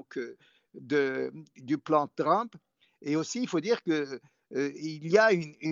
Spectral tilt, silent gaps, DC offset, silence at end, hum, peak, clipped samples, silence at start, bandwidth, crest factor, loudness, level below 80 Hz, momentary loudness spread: -4 dB/octave; none; under 0.1%; 0 s; none; -10 dBFS; under 0.1%; 0.15 s; 7.6 kHz; 20 dB; -29 LUFS; -80 dBFS; 15 LU